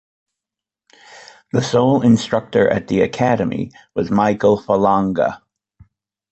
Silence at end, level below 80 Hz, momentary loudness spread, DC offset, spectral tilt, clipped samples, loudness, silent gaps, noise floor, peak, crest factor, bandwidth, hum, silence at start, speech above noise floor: 0.95 s; -50 dBFS; 9 LU; under 0.1%; -6.5 dB/octave; under 0.1%; -17 LUFS; none; -87 dBFS; -2 dBFS; 16 dB; 8.2 kHz; none; 1.15 s; 70 dB